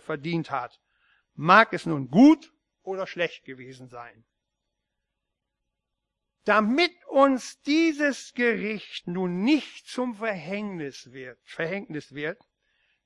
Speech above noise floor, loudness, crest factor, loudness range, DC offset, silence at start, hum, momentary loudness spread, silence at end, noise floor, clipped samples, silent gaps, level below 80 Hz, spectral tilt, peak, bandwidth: 58 dB; -24 LUFS; 24 dB; 11 LU; under 0.1%; 0.1 s; none; 24 LU; 0.7 s; -83 dBFS; under 0.1%; none; -70 dBFS; -5.5 dB/octave; -4 dBFS; 11.5 kHz